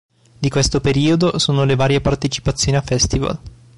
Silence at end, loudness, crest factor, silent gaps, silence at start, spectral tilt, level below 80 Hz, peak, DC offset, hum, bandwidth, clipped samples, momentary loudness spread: 0.25 s; -17 LUFS; 12 dB; none; 0.4 s; -5 dB/octave; -32 dBFS; -6 dBFS; under 0.1%; none; 11.5 kHz; under 0.1%; 6 LU